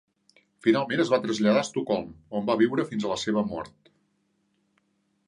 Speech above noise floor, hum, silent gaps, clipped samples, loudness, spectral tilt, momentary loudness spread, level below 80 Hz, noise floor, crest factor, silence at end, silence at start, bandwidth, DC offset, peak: 46 dB; none; none; under 0.1%; -26 LUFS; -5.5 dB/octave; 9 LU; -64 dBFS; -72 dBFS; 20 dB; 1.6 s; 0.65 s; 10.5 kHz; under 0.1%; -8 dBFS